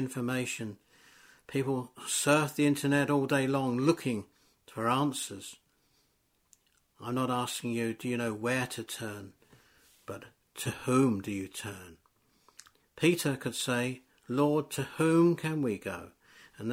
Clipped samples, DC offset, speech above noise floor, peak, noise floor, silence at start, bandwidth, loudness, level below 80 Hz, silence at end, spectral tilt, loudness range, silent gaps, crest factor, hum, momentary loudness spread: under 0.1%; under 0.1%; 43 dB; -12 dBFS; -73 dBFS; 0 s; 16.5 kHz; -31 LUFS; -70 dBFS; 0 s; -5 dB/octave; 7 LU; none; 20 dB; none; 17 LU